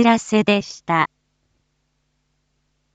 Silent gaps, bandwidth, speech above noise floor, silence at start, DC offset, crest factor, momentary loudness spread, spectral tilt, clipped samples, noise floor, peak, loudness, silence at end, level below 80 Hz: none; 8.8 kHz; 52 dB; 0 s; under 0.1%; 20 dB; 5 LU; -5 dB/octave; under 0.1%; -69 dBFS; -2 dBFS; -19 LUFS; 1.9 s; -62 dBFS